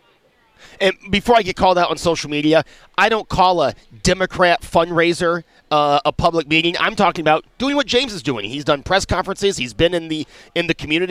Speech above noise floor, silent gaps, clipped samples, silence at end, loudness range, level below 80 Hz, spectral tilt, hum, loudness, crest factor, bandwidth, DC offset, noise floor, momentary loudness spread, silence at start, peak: 39 dB; none; under 0.1%; 0 s; 2 LU; -40 dBFS; -4.5 dB/octave; none; -17 LUFS; 16 dB; 15 kHz; under 0.1%; -56 dBFS; 7 LU; 0.8 s; -2 dBFS